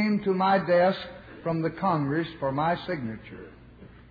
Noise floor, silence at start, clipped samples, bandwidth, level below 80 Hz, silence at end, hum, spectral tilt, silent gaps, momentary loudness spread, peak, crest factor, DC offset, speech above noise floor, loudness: -49 dBFS; 0 s; under 0.1%; 5 kHz; -56 dBFS; 0.15 s; none; -9 dB/octave; none; 17 LU; -12 dBFS; 16 dB; under 0.1%; 23 dB; -26 LUFS